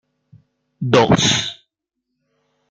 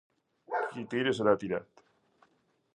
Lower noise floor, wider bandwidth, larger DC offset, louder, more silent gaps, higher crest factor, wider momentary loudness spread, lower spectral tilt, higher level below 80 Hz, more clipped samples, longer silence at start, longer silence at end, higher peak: first, -78 dBFS vs -71 dBFS; about the same, 9.6 kHz vs 9.8 kHz; neither; first, -16 LUFS vs -31 LUFS; neither; about the same, 20 dB vs 24 dB; first, 15 LU vs 9 LU; second, -4 dB/octave vs -6 dB/octave; first, -52 dBFS vs -72 dBFS; neither; first, 0.8 s vs 0.5 s; about the same, 1.2 s vs 1.15 s; first, -2 dBFS vs -10 dBFS